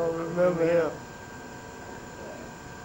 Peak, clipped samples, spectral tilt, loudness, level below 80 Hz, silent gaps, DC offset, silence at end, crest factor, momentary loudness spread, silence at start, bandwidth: -14 dBFS; under 0.1%; -6 dB/octave; -26 LUFS; -56 dBFS; none; under 0.1%; 0 s; 16 dB; 17 LU; 0 s; 16.5 kHz